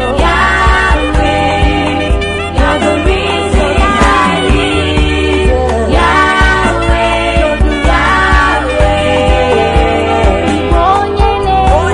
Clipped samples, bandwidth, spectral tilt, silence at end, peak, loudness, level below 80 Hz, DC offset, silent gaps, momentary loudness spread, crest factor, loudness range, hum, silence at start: under 0.1%; 10.5 kHz; -5.5 dB/octave; 0 s; 0 dBFS; -10 LUFS; -16 dBFS; 0.8%; none; 3 LU; 10 dB; 1 LU; none; 0 s